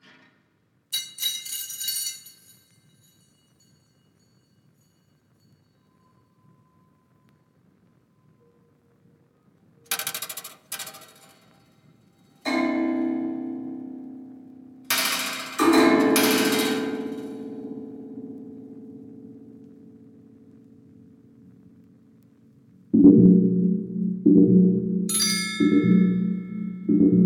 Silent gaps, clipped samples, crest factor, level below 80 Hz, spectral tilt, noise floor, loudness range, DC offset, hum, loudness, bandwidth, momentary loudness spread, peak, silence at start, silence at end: none; under 0.1%; 22 dB; -62 dBFS; -5 dB/octave; -67 dBFS; 18 LU; under 0.1%; none; -22 LUFS; 18 kHz; 23 LU; -4 dBFS; 0.9 s; 0 s